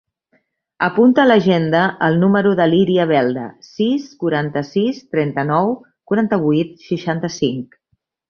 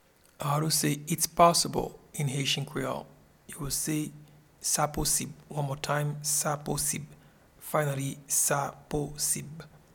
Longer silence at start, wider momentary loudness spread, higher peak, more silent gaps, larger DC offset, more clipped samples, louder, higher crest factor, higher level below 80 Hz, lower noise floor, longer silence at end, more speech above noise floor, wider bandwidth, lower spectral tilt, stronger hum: first, 0.8 s vs 0.4 s; second, 9 LU vs 12 LU; first, -2 dBFS vs -8 dBFS; neither; neither; neither; first, -17 LUFS vs -29 LUFS; second, 16 dB vs 22 dB; second, -58 dBFS vs -52 dBFS; first, -68 dBFS vs -53 dBFS; first, 0.65 s vs 0.2 s; first, 52 dB vs 23 dB; second, 6.8 kHz vs 19 kHz; first, -7 dB/octave vs -3.5 dB/octave; neither